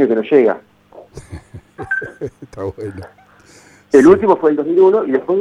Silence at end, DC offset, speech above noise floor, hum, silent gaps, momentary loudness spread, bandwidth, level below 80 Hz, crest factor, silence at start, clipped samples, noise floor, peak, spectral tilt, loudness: 0 s; under 0.1%; 31 dB; 50 Hz at -50 dBFS; none; 25 LU; 10.5 kHz; -48 dBFS; 16 dB; 0 s; under 0.1%; -46 dBFS; 0 dBFS; -7 dB/octave; -13 LUFS